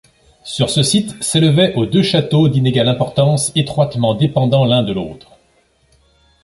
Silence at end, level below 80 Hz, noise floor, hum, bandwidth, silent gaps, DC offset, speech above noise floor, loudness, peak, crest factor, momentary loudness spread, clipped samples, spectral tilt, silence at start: 1.25 s; -46 dBFS; -57 dBFS; none; 11.5 kHz; none; under 0.1%; 42 dB; -14 LUFS; -2 dBFS; 14 dB; 7 LU; under 0.1%; -5.5 dB/octave; 0.45 s